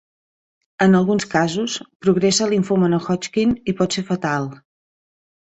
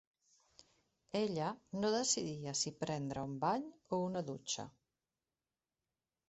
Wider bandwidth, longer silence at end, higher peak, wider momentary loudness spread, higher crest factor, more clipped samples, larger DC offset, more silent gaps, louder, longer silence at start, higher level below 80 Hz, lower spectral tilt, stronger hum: about the same, 8.2 kHz vs 8.2 kHz; second, 0.85 s vs 1.6 s; first, -2 dBFS vs -20 dBFS; about the same, 7 LU vs 7 LU; about the same, 18 dB vs 20 dB; neither; neither; first, 1.95-2.00 s vs none; first, -19 LUFS vs -39 LUFS; second, 0.8 s vs 1.15 s; first, -54 dBFS vs -74 dBFS; about the same, -5 dB/octave vs -4 dB/octave; neither